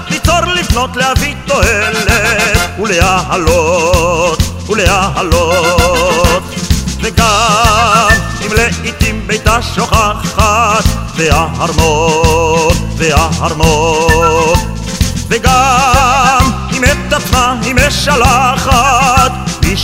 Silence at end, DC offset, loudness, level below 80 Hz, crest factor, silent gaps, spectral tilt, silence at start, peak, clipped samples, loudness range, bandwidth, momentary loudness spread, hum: 0 s; under 0.1%; -10 LUFS; -18 dBFS; 10 dB; none; -4 dB/octave; 0 s; 0 dBFS; 0.5%; 2 LU; 16.5 kHz; 6 LU; none